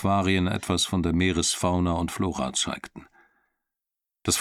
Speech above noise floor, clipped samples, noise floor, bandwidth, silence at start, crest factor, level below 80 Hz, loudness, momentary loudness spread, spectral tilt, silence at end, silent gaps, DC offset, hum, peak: 62 dB; under 0.1%; -88 dBFS; 15.5 kHz; 0 s; 18 dB; -46 dBFS; -25 LUFS; 7 LU; -4 dB/octave; 0 s; none; under 0.1%; none; -10 dBFS